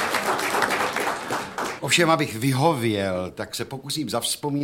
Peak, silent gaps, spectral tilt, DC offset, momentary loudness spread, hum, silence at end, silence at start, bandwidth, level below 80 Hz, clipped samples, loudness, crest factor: -4 dBFS; none; -4 dB/octave; under 0.1%; 10 LU; none; 0 s; 0 s; 17 kHz; -60 dBFS; under 0.1%; -23 LUFS; 20 dB